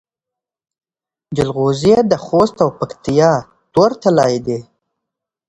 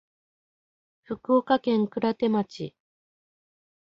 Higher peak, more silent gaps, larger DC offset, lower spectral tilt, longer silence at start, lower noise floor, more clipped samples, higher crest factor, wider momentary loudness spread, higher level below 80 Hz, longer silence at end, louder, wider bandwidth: first, 0 dBFS vs -8 dBFS; neither; neither; about the same, -6.5 dB/octave vs -7.5 dB/octave; first, 1.3 s vs 1.1 s; about the same, -90 dBFS vs under -90 dBFS; neither; about the same, 16 dB vs 20 dB; second, 10 LU vs 16 LU; first, -48 dBFS vs -70 dBFS; second, 0.85 s vs 1.2 s; first, -15 LUFS vs -25 LUFS; first, 11 kHz vs 7.4 kHz